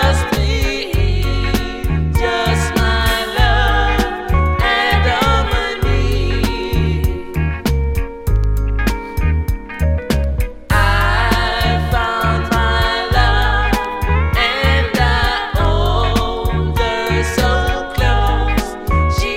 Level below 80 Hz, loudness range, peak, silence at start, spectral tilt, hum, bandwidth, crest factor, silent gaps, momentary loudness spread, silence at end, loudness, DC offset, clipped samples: -20 dBFS; 4 LU; 0 dBFS; 0 s; -5.5 dB/octave; none; 16.5 kHz; 14 dB; none; 5 LU; 0 s; -16 LUFS; under 0.1%; under 0.1%